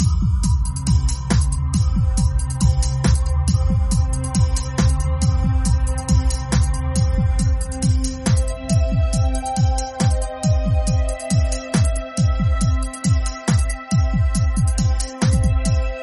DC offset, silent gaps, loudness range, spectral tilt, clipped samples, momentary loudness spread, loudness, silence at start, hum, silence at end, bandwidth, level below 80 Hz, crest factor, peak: under 0.1%; none; 1 LU; -6 dB/octave; under 0.1%; 2 LU; -20 LUFS; 0 s; none; 0 s; 11.5 kHz; -20 dBFS; 14 dB; -4 dBFS